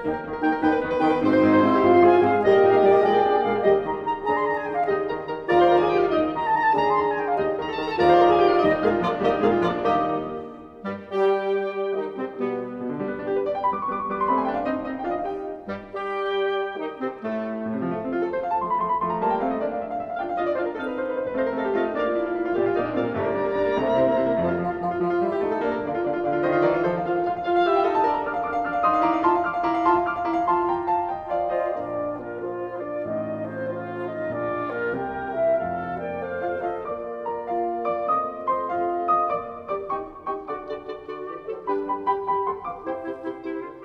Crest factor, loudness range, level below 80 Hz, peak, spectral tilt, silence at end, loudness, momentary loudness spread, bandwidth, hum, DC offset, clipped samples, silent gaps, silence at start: 18 dB; 8 LU; -54 dBFS; -6 dBFS; -8 dB/octave; 0 s; -24 LUFS; 12 LU; 6.6 kHz; none; under 0.1%; under 0.1%; none; 0 s